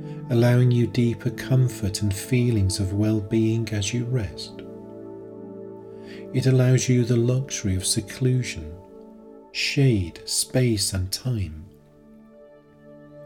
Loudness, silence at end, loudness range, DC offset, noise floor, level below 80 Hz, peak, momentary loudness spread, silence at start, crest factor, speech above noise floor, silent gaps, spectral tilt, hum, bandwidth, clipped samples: -23 LUFS; 0 s; 5 LU; under 0.1%; -50 dBFS; -50 dBFS; -8 dBFS; 20 LU; 0 s; 16 dB; 28 dB; none; -5.5 dB/octave; none; 17 kHz; under 0.1%